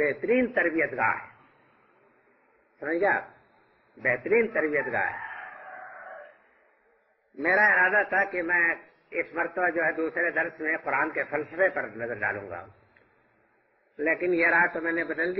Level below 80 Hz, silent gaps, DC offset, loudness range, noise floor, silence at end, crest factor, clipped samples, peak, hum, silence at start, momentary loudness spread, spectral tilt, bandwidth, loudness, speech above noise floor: -68 dBFS; none; under 0.1%; 6 LU; -67 dBFS; 0 s; 16 dB; under 0.1%; -12 dBFS; none; 0 s; 17 LU; -8.5 dB/octave; 5.8 kHz; -26 LUFS; 41 dB